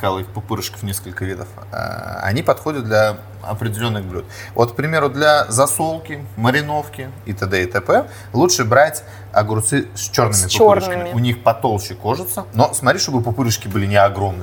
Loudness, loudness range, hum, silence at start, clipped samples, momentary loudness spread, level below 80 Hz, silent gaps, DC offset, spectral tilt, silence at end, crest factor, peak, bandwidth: -17 LUFS; 6 LU; none; 0 s; under 0.1%; 13 LU; -48 dBFS; none; under 0.1%; -4.5 dB/octave; 0 s; 18 dB; 0 dBFS; over 20 kHz